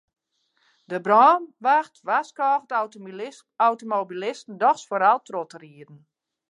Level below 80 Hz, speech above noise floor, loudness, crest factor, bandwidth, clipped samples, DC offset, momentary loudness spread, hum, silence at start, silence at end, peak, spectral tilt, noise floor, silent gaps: -86 dBFS; 47 dB; -22 LUFS; 20 dB; 10.5 kHz; under 0.1%; under 0.1%; 17 LU; none; 0.9 s; 0.55 s; -4 dBFS; -4.5 dB/octave; -70 dBFS; none